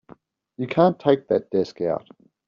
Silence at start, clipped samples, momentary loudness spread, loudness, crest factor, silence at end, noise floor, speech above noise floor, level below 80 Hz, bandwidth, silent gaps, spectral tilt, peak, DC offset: 0.6 s; under 0.1%; 10 LU; -22 LUFS; 20 dB; 0.5 s; -51 dBFS; 30 dB; -64 dBFS; 7.2 kHz; none; -6 dB/octave; -4 dBFS; under 0.1%